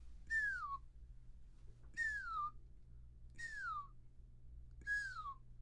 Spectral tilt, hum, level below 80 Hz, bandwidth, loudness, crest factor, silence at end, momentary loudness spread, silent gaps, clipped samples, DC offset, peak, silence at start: -2.5 dB/octave; none; -58 dBFS; 11.5 kHz; -44 LUFS; 16 dB; 0 s; 24 LU; none; under 0.1%; under 0.1%; -32 dBFS; 0 s